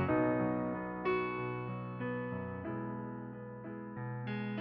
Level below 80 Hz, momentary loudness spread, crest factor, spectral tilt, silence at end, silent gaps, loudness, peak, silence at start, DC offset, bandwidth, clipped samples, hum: -64 dBFS; 12 LU; 16 dB; -7 dB/octave; 0 s; none; -38 LUFS; -20 dBFS; 0 s; under 0.1%; 5.2 kHz; under 0.1%; none